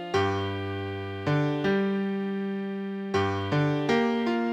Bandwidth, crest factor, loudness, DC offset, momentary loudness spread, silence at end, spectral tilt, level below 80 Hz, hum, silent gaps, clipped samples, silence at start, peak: 9.4 kHz; 14 dB; -28 LUFS; under 0.1%; 8 LU; 0 s; -7 dB/octave; -64 dBFS; none; none; under 0.1%; 0 s; -12 dBFS